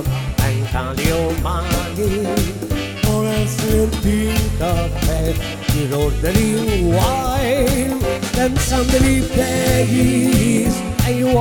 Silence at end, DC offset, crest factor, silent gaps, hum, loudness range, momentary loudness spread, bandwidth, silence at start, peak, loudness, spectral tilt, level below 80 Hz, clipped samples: 0 s; under 0.1%; 16 dB; none; none; 3 LU; 6 LU; over 20 kHz; 0 s; 0 dBFS; -18 LUFS; -5.5 dB/octave; -24 dBFS; under 0.1%